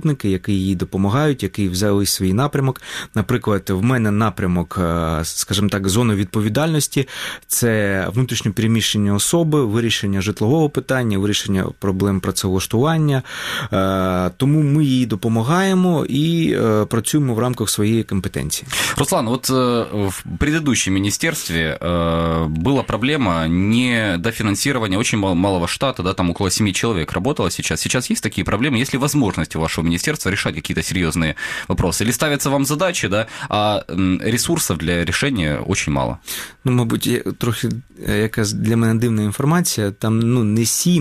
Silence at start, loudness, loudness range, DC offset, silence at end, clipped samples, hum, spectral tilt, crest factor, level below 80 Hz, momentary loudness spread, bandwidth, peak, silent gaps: 0 s; -18 LUFS; 2 LU; 0.1%; 0 s; under 0.1%; none; -5 dB/octave; 14 dB; -40 dBFS; 5 LU; 15 kHz; -4 dBFS; none